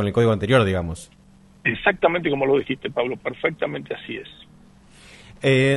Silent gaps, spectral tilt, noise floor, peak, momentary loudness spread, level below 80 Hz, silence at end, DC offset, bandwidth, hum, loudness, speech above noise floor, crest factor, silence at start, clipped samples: none; -6.5 dB/octave; -50 dBFS; -2 dBFS; 14 LU; -48 dBFS; 0 s; under 0.1%; 11.5 kHz; none; -22 LUFS; 28 dB; 20 dB; 0 s; under 0.1%